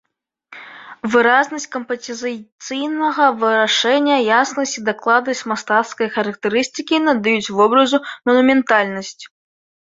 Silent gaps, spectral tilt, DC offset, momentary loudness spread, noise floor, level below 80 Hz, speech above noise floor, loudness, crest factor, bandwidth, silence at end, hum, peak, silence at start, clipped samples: 2.52-2.58 s; -3 dB/octave; under 0.1%; 13 LU; -49 dBFS; -64 dBFS; 32 dB; -17 LUFS; 16 dB; 7.8 kHz; 0.65 s; none; -2 dBFS; 0.5 s; under 0.1%